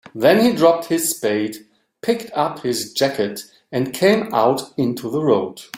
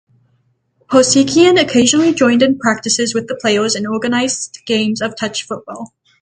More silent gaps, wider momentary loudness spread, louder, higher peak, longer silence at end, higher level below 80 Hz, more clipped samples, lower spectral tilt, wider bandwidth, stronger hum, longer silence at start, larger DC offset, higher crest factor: neither; about the same, 11 LU vs 13 LU; second, -19 LUFS vs -14 LUFS; about the same, -2 dBFS vs 0 dBFS; second, 0 s vs 0.35 s; second, -62 dBFS vs -54 dBFS; neither; first, -4.5 dB/octave vs -3 dB/octave; first, 16.5 kHz vs 9.6 kHz; neither; second, 0.15 s vs 0.9 s; neither; about the same, 18 dB vs 14 dB